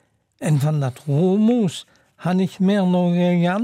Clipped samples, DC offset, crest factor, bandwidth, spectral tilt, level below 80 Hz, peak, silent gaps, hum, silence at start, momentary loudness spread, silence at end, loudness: under 0.1%; under 0.1%; 10 dB; 13.5 kHz; -7.5 dB/octave; -68 dBFS; -8 dBFS; none; none; 0.4 s; 8 LU; 0 s; -19 LUFS